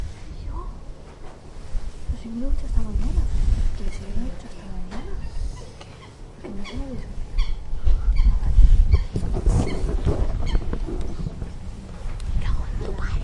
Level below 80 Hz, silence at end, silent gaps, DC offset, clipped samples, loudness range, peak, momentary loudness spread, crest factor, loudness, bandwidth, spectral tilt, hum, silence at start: -22 dBFS; 0 s; none; under 0.1%; under 0.1%; 11 LU; -2 dBFS; 17 LU; 20 dB; -27 LUFS; 9.8 kHz; -7 dB/octave; none; 0 s